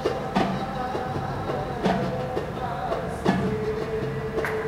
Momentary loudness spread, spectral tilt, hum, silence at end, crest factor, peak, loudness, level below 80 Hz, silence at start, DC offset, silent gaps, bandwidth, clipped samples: 4 LU; -7 dB/octave; none; 0 s; 20 dB; -6 dBFS; -27 LUFS; -44 dBFS; 0 s; under 0.1%; none; 16 kHz; under 0.1%